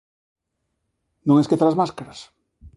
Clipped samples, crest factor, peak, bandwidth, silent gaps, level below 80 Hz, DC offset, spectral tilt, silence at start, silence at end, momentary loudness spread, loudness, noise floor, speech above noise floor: under 0.1%; 18 dB; -4 dBFS; 11.5 kHz; none; -58 dBFS; under 0.1%; -8 dB/octave; 1.25 s; 0.1 s; 19 LU; -19 LUFS; -76 dBFS; 57 dB